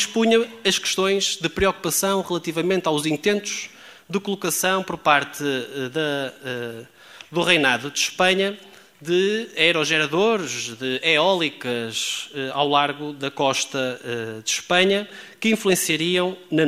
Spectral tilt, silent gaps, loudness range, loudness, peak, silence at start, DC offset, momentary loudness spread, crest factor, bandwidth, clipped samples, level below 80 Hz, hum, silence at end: -3 dB/octave; none; 3 LU; -21 LUFS; -2 dBFS; 0 s; under 0.1%; 11 LU; 20 dB; 16 kHz; under 0.1%; -56 dBFS; none; 0 s